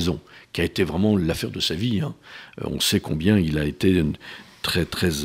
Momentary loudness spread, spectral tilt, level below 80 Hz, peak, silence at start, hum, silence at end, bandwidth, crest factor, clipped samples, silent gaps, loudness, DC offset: 13 LU; -5 dB/octave; -44 dBFS; -6 dBFS; 0 s; none; 0 s; 16 kHz; 18 dB; under 0.1%; none; -23 LUFS; under 0.1%